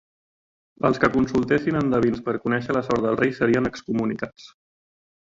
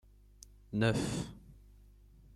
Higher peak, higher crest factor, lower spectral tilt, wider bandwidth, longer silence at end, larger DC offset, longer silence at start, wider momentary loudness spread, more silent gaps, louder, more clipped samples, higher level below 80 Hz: first, -4 dBFS vs -16 dBFS; about the same, 20 dB vs 22 dB; first, -7 dB/octave vs -5.5 dB/octave; second, 7.8 kHz vs 13 kHz; about the same, 0.75 s vs 0.75 s; neither; first, 0.85 s vs 0.7 s; second, 6 LU vs 26 LU; neither; first, -23 LUFS vs -35 LUFS; neither; first, -50 dBFS vs -56 dBFS